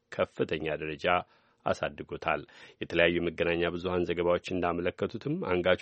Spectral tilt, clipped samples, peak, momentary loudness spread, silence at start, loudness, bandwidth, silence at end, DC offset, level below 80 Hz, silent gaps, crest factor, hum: -6.5 dB/octave; under 0.1%; -8 dBFS; 9 LU; 0.1 s; -31 LUFS; 8.4 kHz; 0 s; under 0.1%; -56 dBFS; none; 22 dB; none